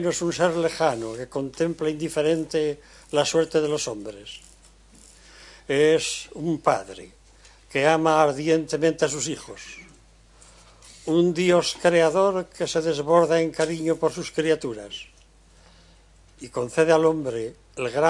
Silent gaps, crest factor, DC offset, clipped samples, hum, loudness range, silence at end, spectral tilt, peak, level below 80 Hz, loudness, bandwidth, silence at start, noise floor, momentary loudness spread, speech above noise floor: none; 20 dB; under 0.1%; under 0.1%; none; 5 LU; 0 s; -4.5 dB/octave; -4 dBFS; -56 dBFS; -23 LUFS; 11.5 kHz; 0 s; -54 dBFS; 18 LU; 31 dB